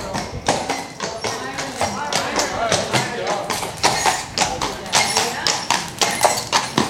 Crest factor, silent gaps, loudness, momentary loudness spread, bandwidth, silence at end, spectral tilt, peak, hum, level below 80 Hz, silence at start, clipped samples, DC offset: 22 dB; none; -20 LUFS; 9 LU; 17 kHz; 0 s; -2 dB/octave; 0 dBFS; none; -46 dBFS; 0 s; under 0.1%; under 0.1%